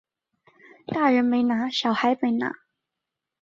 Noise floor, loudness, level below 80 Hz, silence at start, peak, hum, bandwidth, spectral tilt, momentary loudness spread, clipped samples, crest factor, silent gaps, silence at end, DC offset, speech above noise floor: -85 dBFS; -23 LUFS; -70 dBFS; 0.9 s; -6 dBFS; none; 7.4 kHz; -5 dB/octave; 11 LU; under 0.1%; 20 dB; none; 0.85 s; under 0.1%; 63 dB